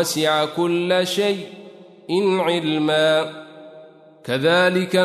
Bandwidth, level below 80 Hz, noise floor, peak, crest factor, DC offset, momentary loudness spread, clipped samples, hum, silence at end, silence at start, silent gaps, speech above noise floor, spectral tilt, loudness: 13.5 kHz; -70 dBFS; -45 dBFS; -4 dBFS; 16 dB; under 0.1%; 14 LU; under 0.1%; none; 0 s; 0 s; none; 26 dB; -4.5 dB/octave; -19 LUFS